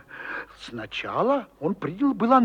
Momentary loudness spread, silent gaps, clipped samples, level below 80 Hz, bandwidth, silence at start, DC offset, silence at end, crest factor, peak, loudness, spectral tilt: 11 LU; none; under 0.1%; -60 dBFS; 9.2 kHz; 0.1 s; under 0.1%; 0 s; 18 dB; -6 dBFS; -26 LUFS; -7 dB/octave